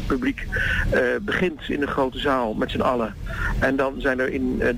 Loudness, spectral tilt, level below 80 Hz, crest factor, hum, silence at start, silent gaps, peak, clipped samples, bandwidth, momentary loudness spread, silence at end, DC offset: -23 LUFS; -6.5 dB/octave; -34 dBFS; 12 dB; none; 0 s; none; -10 dBFS; under 0.1%; 16 kHz; 5 LU; 0 s; under 0.1%